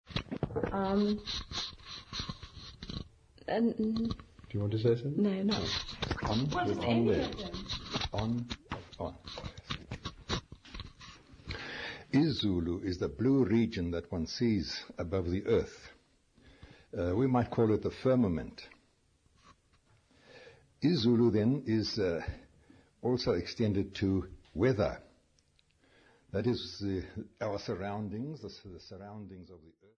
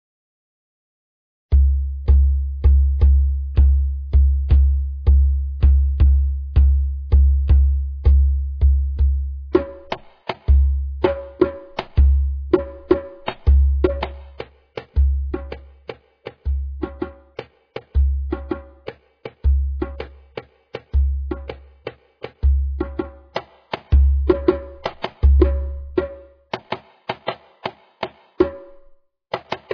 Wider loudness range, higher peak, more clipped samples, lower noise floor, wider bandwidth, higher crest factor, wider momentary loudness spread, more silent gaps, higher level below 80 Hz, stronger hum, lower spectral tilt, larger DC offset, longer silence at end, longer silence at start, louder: second, 7 LU vs 10 LU; second, -16 dBFS vs -2 dBFS; neither; first, -70 dBFS vs -50 dBFS; first, 7.6 kHz vs 5.2 kHz; about the same, 18 dB vs 16 dB; about the same, 18 LU vs 20 LU; neither; second, -52 dBFS vs -20 dBFS; neither; second, -6.5 dB/octave vs -10 dB/octave; neither; first, 0.4 s vs 0 s; second, 0.1 s vs 1.5 s; second, -33 LUFS vs -20 LUFS